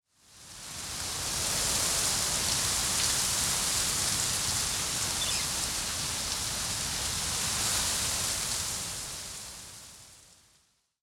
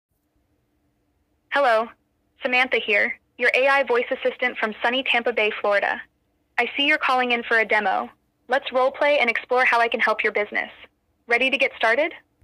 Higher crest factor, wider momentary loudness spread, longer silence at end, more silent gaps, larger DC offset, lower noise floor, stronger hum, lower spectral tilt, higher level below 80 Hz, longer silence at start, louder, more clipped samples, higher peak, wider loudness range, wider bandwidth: about the same, 18 dB vs 18 dB; first, 13 LU vs 8 LU; first, 0.8 s vs 0.25 s; neither; neither; about the same, -69 dBFS vs -69 dBFS; neither; second, -0.5 dB/octave vs -3 dB/octave; first, -50 dBFS vs -68 dBFS; second, 0.3 s vs 1.5 s; second, -28 LUFS vs -21 LUFS; neither; second, -12 dBFS vs -6 dBFS; about the same, 4 LU vs 2 LU; first, 17.5 kHz vs 12.5 kHz